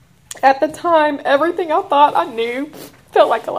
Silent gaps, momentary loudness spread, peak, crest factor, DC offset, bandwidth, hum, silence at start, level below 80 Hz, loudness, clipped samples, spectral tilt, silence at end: none; 9 LU; 0 dBFS; 16 dB; 0.1%; 16 kHz; none; 0.35 s; -60 dBFS; -16 LUFS; under 0.1%; -3.5 dB/octave; 0 s